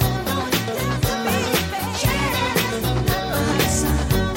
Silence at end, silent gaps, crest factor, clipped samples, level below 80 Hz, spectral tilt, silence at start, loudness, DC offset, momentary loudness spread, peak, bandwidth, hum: 0 s; none; 14 dB; under 0.1%; -30 dBFS; -4.5 dB/octave; 0 s; -21 LUFS; under 0.1%; 3 LU; -6 dBFS; 17 kHz; none